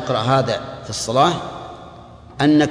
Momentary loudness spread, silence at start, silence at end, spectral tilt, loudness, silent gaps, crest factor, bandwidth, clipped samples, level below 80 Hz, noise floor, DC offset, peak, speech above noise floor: 21 LU; 0 s; 0 s; -5 dB/octave; -19 LUFS; none; 16 dB; 11 kHz; under 0.1%; -48 dBFS; -40 dBFS; under 0.1%; -2 dBFS; 23 dB